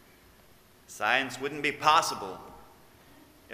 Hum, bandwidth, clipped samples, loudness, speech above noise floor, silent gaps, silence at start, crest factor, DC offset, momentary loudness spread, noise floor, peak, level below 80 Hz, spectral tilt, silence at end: none; 16 kHz; under 0.1%; -27 LUFS; 30 dB; none; 0.9 s; 24 dB; under 0.1%; 19 LU; -58 dBFS; -8 dBFS; -66 dBFS; -2 dB/octave; 0 s